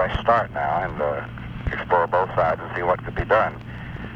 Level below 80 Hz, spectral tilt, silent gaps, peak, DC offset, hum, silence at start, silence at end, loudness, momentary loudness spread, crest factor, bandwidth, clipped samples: -38 dBFS; -7.5 dB/octave; none; -6 dBFS; under 0.1%; none; 0 s; 0 s; -23 LUFS; 12 LU; 16 dB; 7.6 kHz; under 0.1%